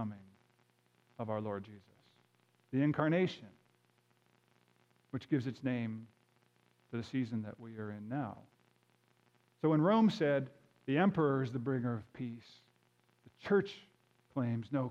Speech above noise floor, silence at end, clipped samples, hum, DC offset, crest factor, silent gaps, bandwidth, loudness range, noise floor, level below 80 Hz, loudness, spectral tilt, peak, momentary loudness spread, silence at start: 39 dB; 0 s; under 0.1%; 60 Hz at -65 dBFS; under 0.1%; 20 dB; none; 8 kHz; 9 LU; -73 dBFS; -78 dBFS; -36 LUFS; -8.5 dB/octave; -18 dBFS; 17 LU; 0 s